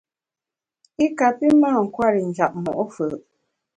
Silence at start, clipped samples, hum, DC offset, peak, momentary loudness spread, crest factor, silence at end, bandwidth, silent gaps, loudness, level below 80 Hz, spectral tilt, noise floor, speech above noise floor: 1 s; under 0.1%; none; under 0.1%; -4 dBFS; 11 LU; 18 dB; 0.55 s; 9.2 kHz; none; -20 LUFS; -60 dBFS; -7 dB/octave; -89 dBFS; 70 dB